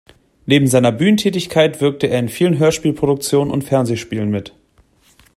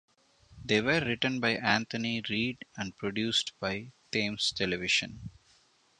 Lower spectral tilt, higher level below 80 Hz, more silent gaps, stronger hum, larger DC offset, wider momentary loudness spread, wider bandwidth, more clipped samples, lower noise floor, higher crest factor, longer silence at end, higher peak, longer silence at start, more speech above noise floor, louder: first, -5.5 dB/octave vs -3.5 dB/octave; first, -50 dBFS vs -60 dBFS; neither; neither; neither; second, 7 LU vs 12 LU; first, 16 kHz vs 11 kHz; neither; second, -54 dBFS vs -66 dBFS; second, 16 dB vs 24 dB; first, 0.9 s vs 0.7 s; first, 0 dBFS vs -8 dBFS; about the same, 0.45 s vs 0.5 s; first, 39 dB vs 34 dB; first, -16 LUFS vs -30 LUFS